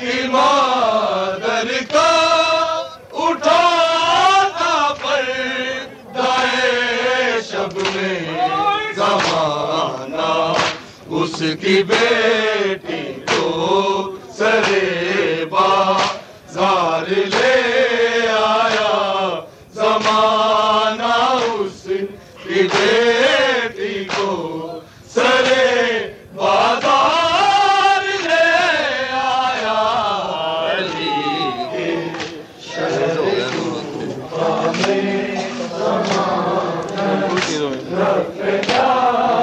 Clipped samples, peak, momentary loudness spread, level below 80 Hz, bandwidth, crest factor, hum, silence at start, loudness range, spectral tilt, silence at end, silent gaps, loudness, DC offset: under 0.1%; -2 dBFS; 10 LU; -56 dBFS; 11 kHz; 16 dB; none; 0 s; 5 LU; -3.5 dB/octave; 0 s; none; -17 LUFS; under 0.1%